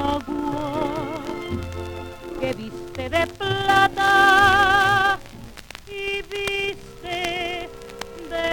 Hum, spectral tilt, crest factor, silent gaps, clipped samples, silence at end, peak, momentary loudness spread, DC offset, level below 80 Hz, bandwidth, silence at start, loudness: none; -4 dB/octave; 18 dB; none; under 0.1%; 0 s; -4 dBFS; 21 LU; under 0.1%; -44 dBFS; over 20 kHz; 0 s; -21 LUFS